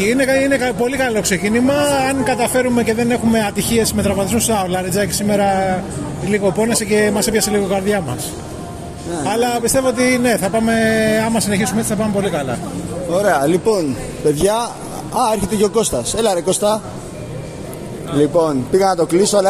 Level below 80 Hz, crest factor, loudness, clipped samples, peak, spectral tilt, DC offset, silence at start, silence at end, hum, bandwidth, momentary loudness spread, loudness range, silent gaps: -40 dBFS; 14 dB; -16 LUFS; under 0.1%; -2 dBFS; -4.5 dB/octave; under 0.1%; 0 s; 0 s; none; 14.5 kHz; 10 LU; 2 LU; none